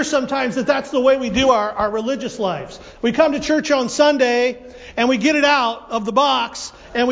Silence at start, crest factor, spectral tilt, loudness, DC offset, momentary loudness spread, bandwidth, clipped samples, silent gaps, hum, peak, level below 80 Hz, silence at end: 0 s; 16 dB; -3.5 dB/octave; -18 LUFS; under 0.1%; 10 LU; 8 kHz; under 0.1%; none; none; -2 dBFS; -48 dBFS; 0 s